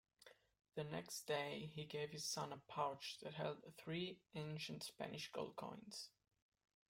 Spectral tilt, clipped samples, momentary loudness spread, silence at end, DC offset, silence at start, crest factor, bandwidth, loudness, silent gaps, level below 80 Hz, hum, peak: -4 dB/octave; under 0.1%; 9 LU; 0.8 s; under 0.1%; 0.2 s; 22 dB; 16 kHz; -49 LUFS; none; -82 dBFS; none; -28 dBFS